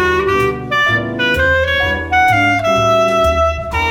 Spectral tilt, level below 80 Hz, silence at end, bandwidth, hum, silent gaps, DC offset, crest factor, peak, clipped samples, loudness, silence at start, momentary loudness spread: -5 dB/octave; -30 dBFS; 0 s; 18 kHz; none; none; under 0.1%; 10 dB; -2 dBFS; under 0.1%; -13 LUFS; 0 s; 4 LU